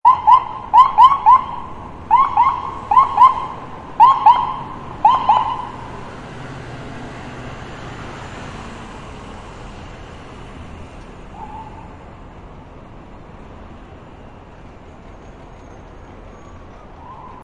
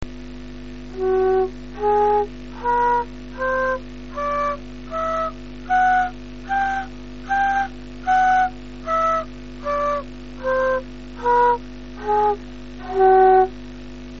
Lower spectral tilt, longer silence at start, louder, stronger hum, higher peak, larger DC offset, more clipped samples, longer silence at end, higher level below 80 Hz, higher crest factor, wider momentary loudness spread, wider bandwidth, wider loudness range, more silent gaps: first, -5 dB/octave vs -3.5 dB/octave; about the same, 0.05 s vs 0 s; first, -13 LUFS vs -21 LUFS; second, none vs 50 Hz at -40 dBFS; first, 0 dBFS vs -6 dBFS; second, under 0.1% vs 1%; neither; about the same, 0.05 s vs 0 s; about the same, -42 dBFS vs -40 dBFS; about the same, 18 dB vs 16 dB; first, 26 LU vs 20 LU; first, 9.4 kHz vs 7.4 kHz; first, 26 LU vs 4 LU; neither